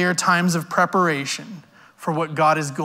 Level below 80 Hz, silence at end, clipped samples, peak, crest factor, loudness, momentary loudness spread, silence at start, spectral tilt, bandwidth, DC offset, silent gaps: -70 dBFS; 0 s; under 0.1%; -4 dBFS; 16 dB; -20 LUFS; 11 LU; 0 s; -4.5 dB/octave; 16 kHz; under 0.1%; none